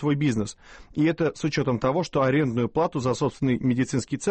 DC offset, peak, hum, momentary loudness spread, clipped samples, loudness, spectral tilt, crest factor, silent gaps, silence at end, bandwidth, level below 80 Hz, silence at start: under 0.1%; -12 dBFS; none; 4 LU; under 0.1%; -25 LUFS; -6.5 dB/octave; 12 dB; none; 0 s; 8.8 kHz; -52 dBFS; 0 s